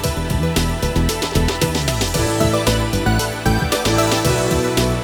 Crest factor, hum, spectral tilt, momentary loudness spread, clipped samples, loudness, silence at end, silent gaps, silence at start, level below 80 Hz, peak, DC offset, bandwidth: 16 dB; none; -4.5 dB/octave; 3 LU; under 0.1%; -18 LUFS; 0 s; none; 0 s; -26 dBFS; -2 dBFS; under 0.1%; over 20 kHz